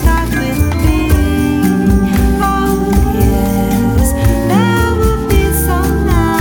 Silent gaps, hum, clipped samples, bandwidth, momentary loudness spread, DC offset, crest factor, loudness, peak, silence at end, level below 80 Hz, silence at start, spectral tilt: none; none; under 0.1%; 18.5 kHz; 2 LU; under 0.1%; 10 dB; -13 LUFS; 0 dBFS; 0 s; -16 dBFS; 0 s; -6.5 dB/octave